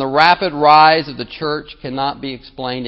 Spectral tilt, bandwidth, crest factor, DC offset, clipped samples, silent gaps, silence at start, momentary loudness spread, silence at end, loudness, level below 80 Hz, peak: -6 dB/octave; 8 kHz; 16 dB; under 0.1%; under 0.1%; none; 0 s; 18 LU; 0 s; -14 LUFS; -48 dBFS; 0 dBFS